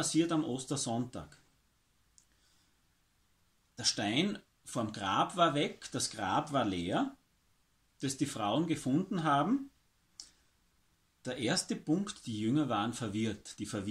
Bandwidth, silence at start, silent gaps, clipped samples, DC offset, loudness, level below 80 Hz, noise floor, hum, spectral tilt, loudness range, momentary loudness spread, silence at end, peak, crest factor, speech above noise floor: 14.5 kHz; 0 s; none; under 0.1%; under 0.1%; -34 LUFS; -68 dBFS; -73 dBFS; none; -4.5 dB/octave; 5 LU; 13 LU; 0 s; -14 dBFS; 20 dB; 40 dB